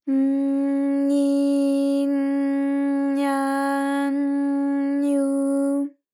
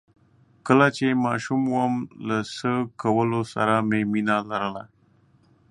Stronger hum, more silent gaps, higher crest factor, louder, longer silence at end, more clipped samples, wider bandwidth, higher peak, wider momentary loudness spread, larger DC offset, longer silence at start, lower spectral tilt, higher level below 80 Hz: neither; neither; second, 10 dB vs 22 dB; about the same, -22 LUFS vs -23 LUFS; second, 0.25 s vs 0.85 s; neither; about the same, 12 kHz vs 11 kHz; second, -12 dBFS vs -2 dBFS; second, 3 LU vs 9 LU; neither; second, 0.05 s vs 0.65 s; second, -4.5 dB/octave vs -6.5 dB/octave; second, under -90 dBFS vs -64 dBFS